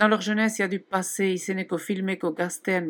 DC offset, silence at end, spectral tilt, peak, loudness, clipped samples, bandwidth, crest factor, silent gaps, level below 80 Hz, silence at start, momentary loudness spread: under 0.1%; 0 s; -4.5 dB/octave; -6 dBFS; -26 LUFS; under 0.1%; 18 kHz; 20 dB; none; -82 dBFS; 0 s; 6 LU